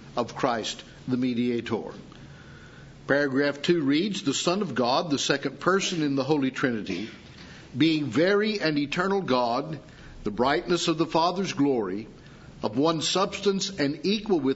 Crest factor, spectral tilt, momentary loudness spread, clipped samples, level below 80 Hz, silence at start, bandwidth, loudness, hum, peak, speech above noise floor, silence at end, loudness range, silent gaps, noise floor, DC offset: 20 dB; -4.5 dB/octave; 14 LU; under 0.1%; -56 dBFS; 0 s; 8 kHz; -26 LUFS; none; -6 dBFS; 21 dB; 0 s; 2 LU; none; -47 dBFS; under 0.1%